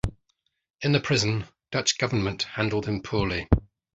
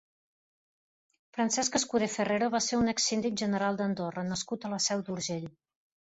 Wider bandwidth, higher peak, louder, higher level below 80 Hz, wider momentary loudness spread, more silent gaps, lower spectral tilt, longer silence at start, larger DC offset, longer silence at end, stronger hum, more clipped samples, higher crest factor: first, 9.2 kHz vs 8.2 kHz; first, -2 dBFS vs -14 dBFS; first, -26 LUFS vs -30 LUFS; first, -38 dBFS vs -64 dBFS; about the same, 7 LU vs 7 LU; first, 0.70-0.74 s vs none; about the same, -4.5 dB/octave vs -3.5 dB/octave; second, 0.05 s vs 1.35 s; neither; second, 0.3 s vs 0.6 s; neither; neither; first, 24 dB vs 18 dB